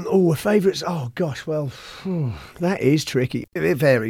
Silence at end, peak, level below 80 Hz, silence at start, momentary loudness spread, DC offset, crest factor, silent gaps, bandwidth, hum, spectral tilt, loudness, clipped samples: 0 s; -4 dBFS; -52 dBFS; 0 s; 9 LU; under 0.1%; 16 dB; none; 17 kHz; none; -6.5 dB/octave; -22 LUFS; under 0.1%